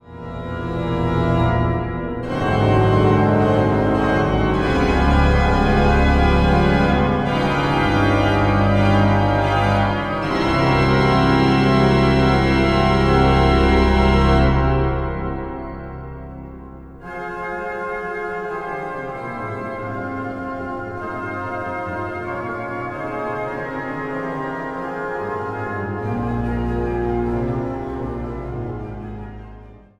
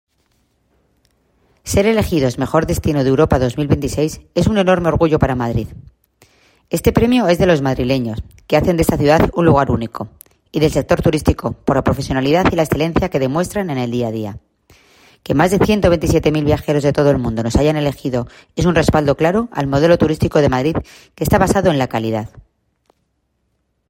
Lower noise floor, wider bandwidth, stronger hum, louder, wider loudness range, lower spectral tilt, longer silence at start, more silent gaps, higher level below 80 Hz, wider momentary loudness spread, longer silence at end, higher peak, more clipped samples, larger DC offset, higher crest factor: second, -41 dBFS vs -67 dBFS; second, 11 kHz vs 16.5 kHz; neither; second, -19 LUFS vs -16 LUFS; first, 11 LU vs 3 LU; about the same, -7.5 dB/octave vs -6.5 dB/octave; second, 0.05 s vs 1.65 s; neither; first, -26 dBFS vs -32 dBFS; first, 13 LU vs 9 LU; second, 0.25 s vs 1.5 s; about the same, -2 dBFS vs 0 dBFS; neither; neither; about the same, 16 dB vs 16 dB